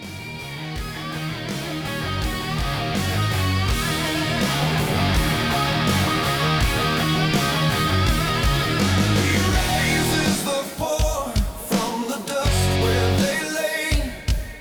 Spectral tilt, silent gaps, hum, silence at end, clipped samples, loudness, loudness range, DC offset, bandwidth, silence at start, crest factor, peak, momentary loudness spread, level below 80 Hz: -4.5 dB/octave; none; none; 0 s; under 0.1%; -21 LUFS; 4 LU; under 0.1%; over 20 kHz; 0 s; 14 dB; -6 dBFS; 8 LU; -30 dBFS